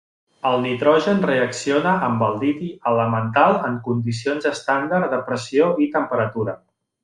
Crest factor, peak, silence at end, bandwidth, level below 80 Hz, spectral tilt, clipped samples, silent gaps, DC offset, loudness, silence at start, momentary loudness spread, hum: 18 dB; -2 dBFS; 0.45 s; 11 kHz; -62 dBFS; -6 dB/octave; under 0.1%; none; under 0.1%; -20 LUFS; 0.45 s; 7 LU; none